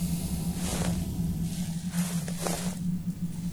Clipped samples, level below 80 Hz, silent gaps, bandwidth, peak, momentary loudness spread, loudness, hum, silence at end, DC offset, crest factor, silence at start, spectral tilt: under 0.1%; -42 dBFS; none; over 20 kHz; -12 dBFS; 3 LU; -31 LUFS; none; 0 s; under 0.1%; 18 dB; 0 s; -5.5 dB/octave